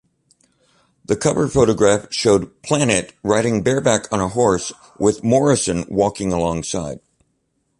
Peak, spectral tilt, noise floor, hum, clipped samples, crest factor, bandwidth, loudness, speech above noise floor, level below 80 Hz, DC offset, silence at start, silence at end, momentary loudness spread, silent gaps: -2 dBFS; -5 dB/octave; -68 dBFS; none; under 0.1%; 18 dB; 11.5 kHz; -18 LUFS; 51 dB; -44 dBFS; under 0.1%; 1.1 s; 0.85 s; 8 LU; none